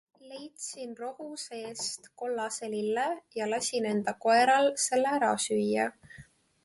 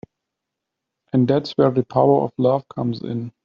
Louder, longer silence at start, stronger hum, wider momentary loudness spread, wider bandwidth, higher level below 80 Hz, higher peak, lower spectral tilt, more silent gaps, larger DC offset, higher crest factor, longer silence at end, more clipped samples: second, -29 LUFS vs -20 LUFS; second, 0.25 s vs 1.15 s; neither; first, 16 LU vs 9 LU; first, 12 kHz vs 7 kHz; second, -74 dBFS vs -60 dBFS; second, -12 dBFS vs -2 dBFS; second, -3 dB/octave vs -7.5 dB/octave; neither; neither; about the same, 18 dB vs 18 dB; first, 0.45 s vs 0.15 s; neither